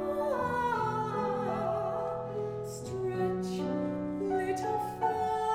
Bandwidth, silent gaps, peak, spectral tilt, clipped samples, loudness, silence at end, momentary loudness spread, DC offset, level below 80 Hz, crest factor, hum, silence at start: 16 kHz; none; -18 dBFS; -6.5 dB/octave; under 0.1%; -33 LUFS; 0 s; 5 LU; under 0.1%; -60 dBFS; 14 dB; none; 0 s